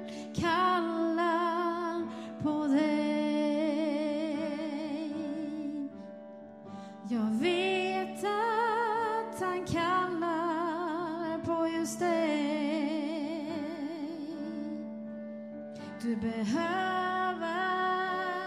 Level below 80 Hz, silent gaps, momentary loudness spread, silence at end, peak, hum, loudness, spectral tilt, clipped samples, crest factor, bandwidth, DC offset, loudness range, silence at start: -68 dBFS; none; 12 LU; 0 s; -18 dBFS; none; -32 LUFS; -5 dB/octave; under 0.1%; 14 dB; 13.5 kHz; under 0.1%; 6 LU; 0 s